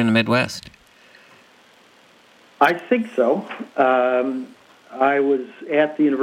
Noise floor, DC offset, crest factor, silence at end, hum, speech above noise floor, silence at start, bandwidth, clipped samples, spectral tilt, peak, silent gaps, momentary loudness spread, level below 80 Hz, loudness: -52 dBFS; under 0.1%; 18 dB; 0 s; none; 33 dB; 0 s; 16 kHz; under 0.1%; -6 dB/octave; -2 dBFS; none; 12 LU; -66 dBFS; -20 LUFS